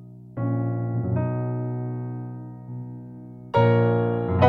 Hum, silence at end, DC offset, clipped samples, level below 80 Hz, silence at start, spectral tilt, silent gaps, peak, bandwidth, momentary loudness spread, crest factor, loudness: none; 0 s; under 0.1%; under 0.1%; -52 dBFS; 0 s; -10 dB/octave; none; -2 dBFS; 4.6 kHz; 18 LU; 22 dB; -25 LUFS